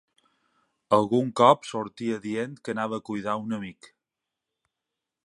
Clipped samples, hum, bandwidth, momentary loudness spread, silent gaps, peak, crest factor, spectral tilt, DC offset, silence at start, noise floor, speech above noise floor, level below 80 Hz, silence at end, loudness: under 0.1%; none; 11.5 kHz; 14 LU; none; -4 dBFS; 24 dB; -6 dB/octave; under 0.1%; 0.9 s; -87 dBFS; 61 dB; -70 dBFS; 1.55 s; -26 LUFS